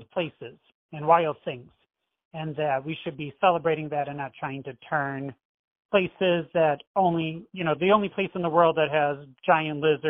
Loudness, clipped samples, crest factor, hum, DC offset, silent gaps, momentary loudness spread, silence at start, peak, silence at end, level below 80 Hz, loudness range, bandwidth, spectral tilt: -26 LUFS; under 0.1%; 20 dB; none; under 0.1%; 0.74-0.89 s, 2.25-2.31 s, 5.45-5.75 s, 5.85-5.89 s, 6.87-6.94 s; 14 LU; 0 s; -6 dBFS; 0 s; -66 dBFS; 5 LU; 5.4 kHz; -9.5 dB/octave